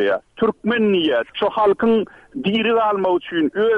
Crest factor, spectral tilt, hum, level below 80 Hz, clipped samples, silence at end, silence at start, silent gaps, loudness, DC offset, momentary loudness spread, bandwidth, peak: 10 dB; -7.5 dB/octave; none; -56 dBFS; under 0.1%; 0 s; 0 s; none; -19 LUFS; under 0.1%; 5 LU; 5 kHz; -8 dBFS